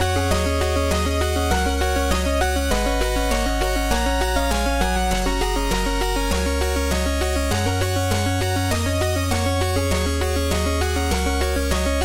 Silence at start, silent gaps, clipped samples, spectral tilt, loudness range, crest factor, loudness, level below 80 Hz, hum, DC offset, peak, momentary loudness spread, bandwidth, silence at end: 0 s; none; under 0.1%; -4.5 dB/octave; 1 LU; 14 dB; -21 LUFS; -24 dBFS; none; 0.3%; -6 dBFS; 1 LU; 18 kHz; 0 s